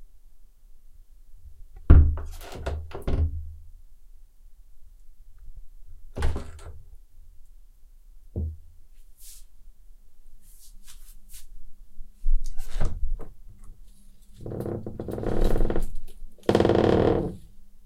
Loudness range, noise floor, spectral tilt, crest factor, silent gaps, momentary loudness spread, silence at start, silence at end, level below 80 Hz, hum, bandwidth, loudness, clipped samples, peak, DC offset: 17 LU; -48 dBFS; -7.5 dB/octave; 24 dB; none; 28 LU; 0 s; 0.05 s; -30 dBFS; none; 12.5 kHz; -27 LUFS; under 0.1%; -2 dBFS; under 0.1%